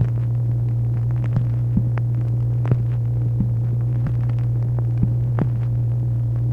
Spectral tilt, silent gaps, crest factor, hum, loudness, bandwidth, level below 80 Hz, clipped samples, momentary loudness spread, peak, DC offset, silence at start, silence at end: -11 dB/octave; none; 16 dB; none; -21 LUFS; 2.6 kHz; -36 dBFS; under 0.1%; 1 LU; -4 dBFS; under 0.1%; 0 s; 0 s